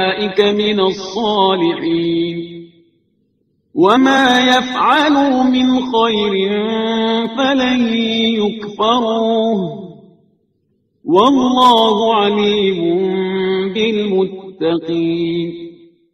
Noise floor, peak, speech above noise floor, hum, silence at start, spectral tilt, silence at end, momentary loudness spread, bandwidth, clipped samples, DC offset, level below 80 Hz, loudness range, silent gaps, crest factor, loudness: -63 dBFS; 0 dBFS; 49 dB; none; 0 s; -5 dB/octave; 0.4 s; 10 LU; 11 kHz; under 0.1%; under 0.1%; -54 dBFS; 5 LU; none; 14 dB; -14 LUFS